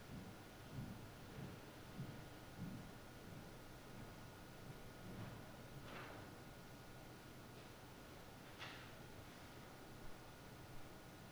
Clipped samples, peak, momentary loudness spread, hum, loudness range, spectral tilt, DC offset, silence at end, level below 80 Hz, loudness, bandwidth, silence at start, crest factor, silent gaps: under 0.1%; -38 dBFS; 5 LU; none; 2 LU; -5 dB/octave; under 0.1%; 0 s; -66 dBFS; -56 LUFS; over 20 kHz; 0 s; 18 dB; none